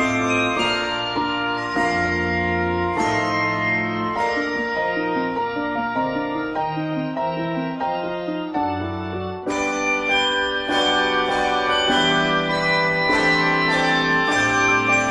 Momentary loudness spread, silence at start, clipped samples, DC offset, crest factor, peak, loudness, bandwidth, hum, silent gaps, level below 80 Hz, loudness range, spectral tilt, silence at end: 8 LU; 0 s; under 0.1%; under 0.1%; 16 dB; -6 dBFS; -20 LUFS; 11.5 kHz; none; none; -48 dBFS; 7 LU; -4 dB/octave; 0 s